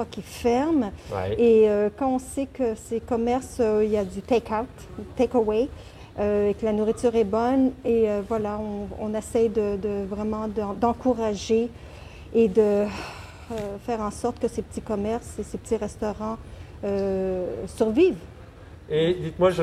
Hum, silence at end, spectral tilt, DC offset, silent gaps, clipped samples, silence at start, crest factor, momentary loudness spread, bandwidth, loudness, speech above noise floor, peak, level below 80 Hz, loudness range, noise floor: none; 0 s; -6.5 dB/octave; under 0.1%; none; under 0.1%; 0 s; 16 dB; 12 LU; 14 kHz; -25 LUFS; 20 dB; -8 dBFS; -46 dBFS; 6 LU; -44 dBFS